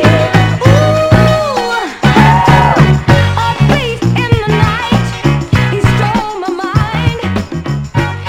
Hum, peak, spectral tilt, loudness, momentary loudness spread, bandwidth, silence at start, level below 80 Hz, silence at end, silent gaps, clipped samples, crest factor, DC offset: none; 0 dBFS; -6.5 dB/octave; -11 LUFS; 9 LU; 15.5 kHz; 0 s; -26 dBFS; 0 s; none; 2%; 10 dB; under 0.1%